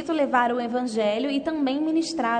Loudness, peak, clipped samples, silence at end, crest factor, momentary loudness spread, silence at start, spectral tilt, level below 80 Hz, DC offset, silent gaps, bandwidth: -24 LUFS; -8 dBFS; under 0.1%; 0 s; 16 dB; 4 LU; 0 s; -4 dB/octave; -64 dBFS; under 0.1%; none; 9.4 kHz